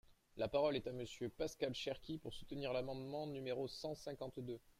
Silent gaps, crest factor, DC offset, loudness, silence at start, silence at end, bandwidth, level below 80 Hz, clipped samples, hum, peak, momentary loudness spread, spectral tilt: none; 18 dB; under 0.1%; -44 LUFS; 0.1 s; 0.2 s; 16 kHz; -66 dBFS; under 0.1%; none; -26 dBFS; 10 LU; -5.5 dB/octave